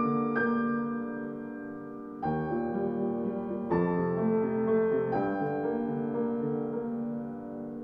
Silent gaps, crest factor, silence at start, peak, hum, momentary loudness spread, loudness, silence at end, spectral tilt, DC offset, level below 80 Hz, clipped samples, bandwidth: none; 14 dB; 0 s; -16 dBFS; none; 11 LU; -31 LUFS; 0 s; -11 dB/octave; under 0.1%; -62 dBFS; under 0.1%; 5.2 kHz